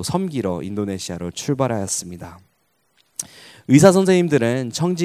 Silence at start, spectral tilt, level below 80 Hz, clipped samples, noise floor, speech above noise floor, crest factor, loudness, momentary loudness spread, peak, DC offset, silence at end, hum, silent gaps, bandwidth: 0 s; -5.5 dB/octave; -50 dBFS; under 0.1%; -66 dBFS; 47 dB; 20 dB; -19 LUFS; 22 LU; 0 dBFS; under 0.1%; 0 s; none; none; 16 kHz